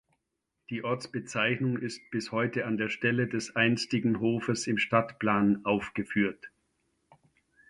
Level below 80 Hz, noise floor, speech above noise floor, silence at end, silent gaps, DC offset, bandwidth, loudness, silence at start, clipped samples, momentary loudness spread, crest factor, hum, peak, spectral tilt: -66 dBFS; -83 dBFS; 54 dB; 1.2 s; none; under 0.1%; 11.5 kHz; -29 LUFS; 0.7 s; under 0.1%; 8 LU; 22 dB; none; -10 dBFS; -5.5 dB/octave